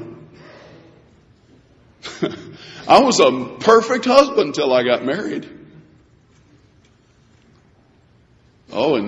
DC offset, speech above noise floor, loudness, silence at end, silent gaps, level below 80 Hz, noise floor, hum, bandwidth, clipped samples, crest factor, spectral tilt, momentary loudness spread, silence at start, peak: under 0.1%; 38 dB; -16 LUFS; 0 s; none; -58 dBFS; -54 dBFS; none; 11 kHz; under 0.1%; 20 dB; -4 dB/octave; 22 LU; 0 s; 0 dBFS